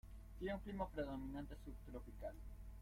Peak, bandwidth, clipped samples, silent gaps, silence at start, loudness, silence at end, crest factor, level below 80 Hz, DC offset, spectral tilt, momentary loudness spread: -32 dBFS; 16.5 kHz; under 0.1%; none; 0.05 s; -50 LUFS; 0 s; 18 dB; -56 dBFS; under 0.1%; -7.5 dB/octave; 11 LU